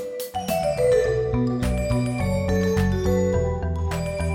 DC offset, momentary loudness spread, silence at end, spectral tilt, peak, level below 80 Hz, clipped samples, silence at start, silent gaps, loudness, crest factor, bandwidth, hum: under 0.1%; 6 LU; 0 s; -7 dB/octave; -10 dBFS; -32 dBFS; under 0.1%; 0 s; none; -23 LUFS; 12 dB; 16.5 kHz; none